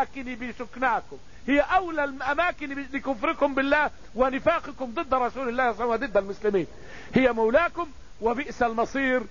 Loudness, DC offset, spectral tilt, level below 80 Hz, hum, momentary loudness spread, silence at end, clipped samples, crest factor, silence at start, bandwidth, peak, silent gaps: -26 LUFS; 0.8%; -5.5 dB/octave; -48 dBFS; none; 12 LU; 0 s; under 0.1%; 20 dB; 0 s; 7.4 kHz; -6 dBFS; none